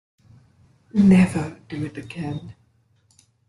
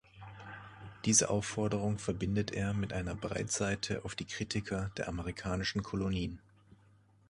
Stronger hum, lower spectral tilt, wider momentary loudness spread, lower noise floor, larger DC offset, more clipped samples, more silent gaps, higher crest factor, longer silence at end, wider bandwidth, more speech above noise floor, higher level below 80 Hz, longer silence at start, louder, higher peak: neither; first, -8 dB/octave vs -4 dB/octave; second, 17 LU vs 20 LU; about the same, -62 dBFS vs -65 dBFS; neither; neither; neither; second, 18 dB vs 24 dB; first, 0.95 s vs 0.55 s; about the same, 11.5 kHz vs 11.5 kHz; first, 42 dB vs 30 dB; about the same, -54 dBFS vs -52 dBFS; first, 0.95 s vs 0.15 s; first, -21 LUFS vs -35 LUFS; first, -6 dBFS vs -12 dBFS